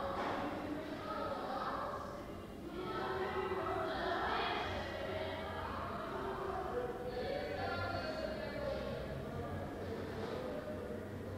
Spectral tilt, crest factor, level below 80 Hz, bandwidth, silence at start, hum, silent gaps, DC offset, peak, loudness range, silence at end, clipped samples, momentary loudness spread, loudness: -6 dB/octave; 16 dB; -58 dBFS; 16 kHz; 0 s; none; none; under 0.1%; -26 dBFS; 2 LU; 0 s; under 0.1%; 6 LU; -41 LUFS